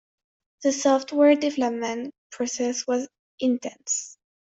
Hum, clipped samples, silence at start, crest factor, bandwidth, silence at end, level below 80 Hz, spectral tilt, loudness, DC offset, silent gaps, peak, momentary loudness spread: none; under 0.1%; 0.6 s; 20 dB; 8 kHz; 0.45 s; -72 dBFS; -2.5 dB/octave; -24 LUFS; under 0.1%; 2.18-2.30 s, 3.19-3.38 s; -6 dBFS; 13 LU